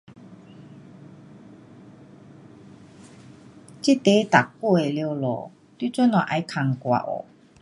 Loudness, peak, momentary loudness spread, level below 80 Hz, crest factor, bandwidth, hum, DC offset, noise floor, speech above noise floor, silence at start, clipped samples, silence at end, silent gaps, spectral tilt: -23 LUFS; 0 dBFS; 14 LU; -68 dBFS; 24 dB; 11.5 kHz; none; under 0.1%; -47 dBFS; 26 dB; 0.1 s; under 0.1%; 0.4 s; none; -6 dB/octave